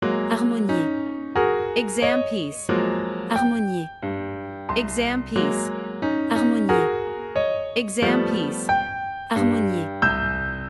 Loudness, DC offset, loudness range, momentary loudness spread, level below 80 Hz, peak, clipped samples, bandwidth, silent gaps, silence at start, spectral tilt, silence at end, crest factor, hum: -23 LUFS; under 0.1%; 2 LU; 8 LU; -46 dBFS; -6 dBFS; under 0.1%; 12 kHz; none; 0 s; -5 dB/octave; 0 s; 16 dB; none